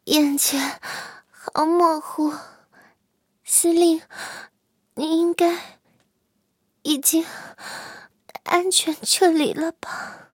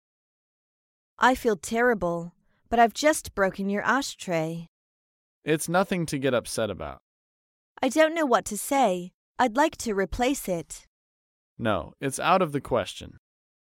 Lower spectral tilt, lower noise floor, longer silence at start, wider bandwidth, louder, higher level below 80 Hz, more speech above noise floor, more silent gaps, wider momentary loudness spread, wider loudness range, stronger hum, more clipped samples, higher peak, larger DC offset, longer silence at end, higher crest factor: second, -1.5 dB/octave vs -4.5 dB/octave; second, -70 dBFS vs under -90 dBFS; second, 0.05 s vs 1.2 s; about the same, 17 kHz vs 17 kHz; first, -20 LUFS vs -26 LUFS; second, -72 dBFS vs -52 dBFS; second, 49 dB vs over 65 dB; second, none vs 4.68-5.42 s, 7.00-7.75 s, 9.14-9.35 s, 10.87-11.57 s; first, 19 LU vs 12 LU; about the same, 4 LU vs 4 LU; neither; neither; first, -2 dBFS vs -6 dBFS; neither; second, 0.15 s vs 0.7 s; about the same, 22 dB vs 20 dB